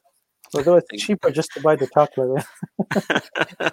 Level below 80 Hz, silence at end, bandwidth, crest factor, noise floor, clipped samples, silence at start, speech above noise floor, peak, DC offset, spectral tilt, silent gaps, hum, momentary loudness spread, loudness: -62 dBFS; 0 s; 16 kHz; 20 dB; -56 dBFS; under 0.1%; 0.5 s; 36 dB; -2 dBFS; under 0.1%; -5 dB/octave; none; none; 9 LU; -21 LUFS